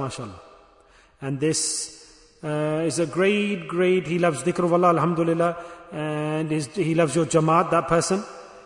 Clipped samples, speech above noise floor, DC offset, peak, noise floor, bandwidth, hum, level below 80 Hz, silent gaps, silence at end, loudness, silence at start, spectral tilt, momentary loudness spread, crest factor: under 0.1%; 33 dB; under 0.1%; -6 dBFS; -55 dBFS; 11 kHz; none; -58 dBFS; none; 0.05 s; -23 LUFS; 0 s; -5 dB/octave; 14 LU; 18 dB